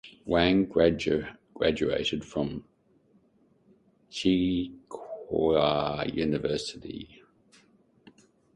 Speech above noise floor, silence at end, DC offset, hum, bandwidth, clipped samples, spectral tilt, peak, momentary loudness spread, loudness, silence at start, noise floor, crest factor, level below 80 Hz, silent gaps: 38 dB; 1.5 s; under 0.1%; none; 10.5 kHz; under 0.1%; -6 dB/octave; -8 dBFS; 17 LU; -27 LUFS; 0.05 s; -65 dBFS; 22 dB; -52 dBFS; none